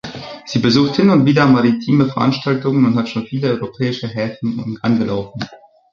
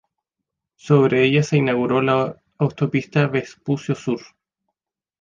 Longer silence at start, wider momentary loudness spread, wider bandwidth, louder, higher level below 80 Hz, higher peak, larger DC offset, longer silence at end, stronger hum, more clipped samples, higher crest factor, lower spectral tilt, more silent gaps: second, 0.05 s vs 0.85 s; about the same, 11 LU vs 10 LU; about the same, 7.4 kHz vs 7.4 kHz; first, -16 LUFS vs -20 LUFS; first, -52 dBFS vs -58 dBFS; about the same, -2 dBFS vs -2 dBFS; neither; second, 0.35 s vs 1 s; neither; neither; about the same, 14 dB vs 18 dB; about the same, -7 dB/octave vs -7 dB/octave; neither